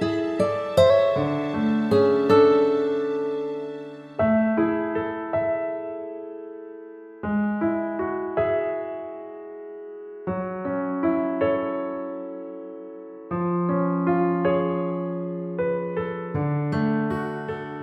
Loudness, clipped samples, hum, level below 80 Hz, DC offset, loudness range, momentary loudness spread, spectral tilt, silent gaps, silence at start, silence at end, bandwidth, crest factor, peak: -24 LUFS; under 0.1%; none; -58 dBFS; under 0.1%; 8 LU; 18 LU; -8 dB/octave; none; 0 s; 0 s; 12 kHz; 20 dB; -4 dBFS